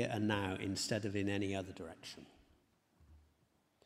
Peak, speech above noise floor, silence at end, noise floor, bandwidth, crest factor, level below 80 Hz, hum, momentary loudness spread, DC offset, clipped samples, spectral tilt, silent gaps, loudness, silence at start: -20 dBFS; 37 dB; 0.7 s; -76 dBFS; 16 kHz; 20 dB; -72 dBFS; none; 15 LU; under 0.1%; under 0.1%; -5 dB/octave; none; -39 LUFS; 0 s